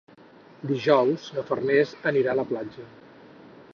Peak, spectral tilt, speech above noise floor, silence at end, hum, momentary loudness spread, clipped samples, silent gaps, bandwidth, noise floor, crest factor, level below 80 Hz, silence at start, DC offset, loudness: -6 dBFS; -7 dB/octave; 27 dB; 0.85 s; none; 15 LU; under 0.1%; none; 6.8 kHz; -51 dBFS; 20 dB; -68 dBFS; 0.65 s; under 0.1%; -24 LUFS